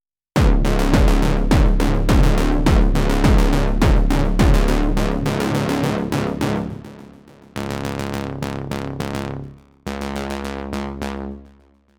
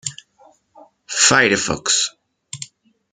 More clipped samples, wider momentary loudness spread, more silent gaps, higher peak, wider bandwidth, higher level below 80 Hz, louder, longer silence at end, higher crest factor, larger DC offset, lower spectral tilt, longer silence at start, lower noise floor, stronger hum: neither; second, 14 LU vs 21 LU; neither; about the same, 0 dBFS vs 0 dBFS; first, 16.5 kHz vs 11 kHz; first, -20 dBFS vs -56 dBFS; second, -20 LUFS vs -15 LUFS; about the same, 0.55 s vs 0.45 s; about the same, 18 dB vs 22 dB; neither; first, -6.5 dB/octave vs -1.5 dB/octave; first, 0.35 s vs 0.05 s; about the same, -52 dBFS vs -53 dBFS; neither